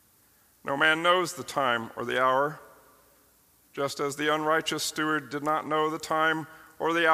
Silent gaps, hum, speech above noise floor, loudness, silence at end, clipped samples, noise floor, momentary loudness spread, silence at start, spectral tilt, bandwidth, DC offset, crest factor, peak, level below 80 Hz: none; none; 36 dB; -27 LUFS; 0 s; under 0.1%; -62 dBFS; 10 LU; 0.65 s; -3 dB/octave; 15.5 kHz; under 0.1%; 22 dB; -6 dBFS; -70 dBFS